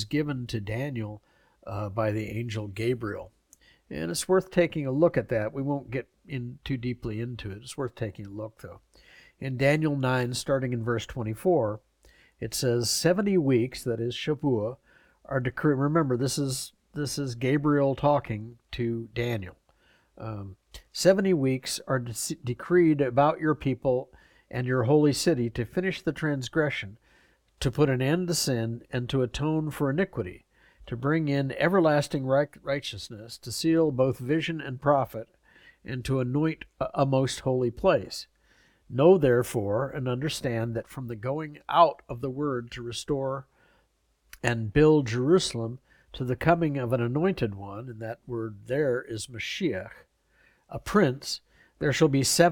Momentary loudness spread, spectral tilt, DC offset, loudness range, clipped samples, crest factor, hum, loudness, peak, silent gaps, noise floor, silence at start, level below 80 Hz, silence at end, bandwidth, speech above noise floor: 15 LU; -5.5 dB/octave; under 0.1%; 5 LU; under 0.1%; 22 dB; none; -27 LUFS; -6 dBFS; none; -69 dBFS; 0 s; -54 dBFS; 0 s; 18 kHz; 42 dB